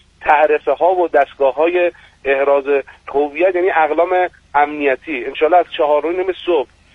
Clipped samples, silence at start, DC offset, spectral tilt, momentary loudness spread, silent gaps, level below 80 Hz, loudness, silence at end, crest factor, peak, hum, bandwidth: under 0.1%; 0.2 s; under 0.1%; -5.5 dB/octave; 6 LU; none; -52 dBFS; -16 LUFS; 0.3 s; 16 dB; 0 dBFS; none; 6 kHz